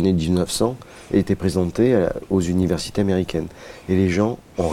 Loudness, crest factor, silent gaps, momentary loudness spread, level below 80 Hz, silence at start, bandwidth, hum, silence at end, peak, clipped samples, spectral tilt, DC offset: -21 LUFS; 16 dB; none; 8 LU; -44 dBFS; 0 s; 15.5 kHz; none; 0 s; -4 dBFS; under 0.1%; -6.5 dB/octave; under 0.1%